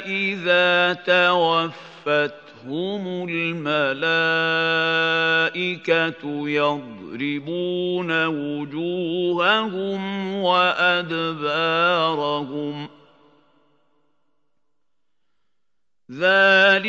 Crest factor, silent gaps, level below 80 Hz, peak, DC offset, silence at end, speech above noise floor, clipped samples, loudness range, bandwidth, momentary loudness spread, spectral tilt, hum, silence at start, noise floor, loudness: 18 dB; none; -76 dBFS; -4 dBFS; under 0.1%; 0 s; 63 dB; under 0.1%; 5 LU; 7.8 kHz; 12 LU; -5.5 dB/octave; none; 0 s; -84 dBFS; -20 LUFS